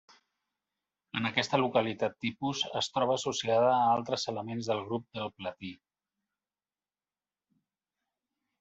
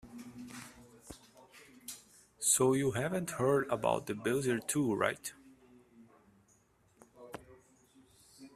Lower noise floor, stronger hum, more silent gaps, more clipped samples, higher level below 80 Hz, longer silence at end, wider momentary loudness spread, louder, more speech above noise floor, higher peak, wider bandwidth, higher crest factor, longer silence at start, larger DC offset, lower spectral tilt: first, under -90 dBFS vs -69 dBFS; first, 50 Hz at -70 dBFS vs none; neither; neither; second, -74 dBFS vs -68 dBFS; first, 2.85 s vs 0.05 s; second, 13 LU vs 23 LU; about the same, -31 LUFS vs -32 LUFS; first, over 59 dB vs 37 dB; about the same, -10 dBFS vs -12 dBFS; second, 8.2 kHz vs 15.5 kHz; about the same, 22 dB vs 24 dB; first, 1.15 s vs 0.05 s; neither; about the same, -4 dB/octave vs -4 dB/octave